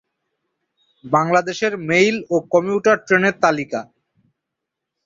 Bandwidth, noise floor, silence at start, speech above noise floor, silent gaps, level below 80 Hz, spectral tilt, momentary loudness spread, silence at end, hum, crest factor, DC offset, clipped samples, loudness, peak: 7.8 kHz; -81 dBFS; 1.05 s; 64 dB; none; -62 dBFS; -5 dB/octave; 7 LU; 1.25 s; none; 18 dB; under 0.1%; under 0.1%; -18 LUFS; -2 dBFS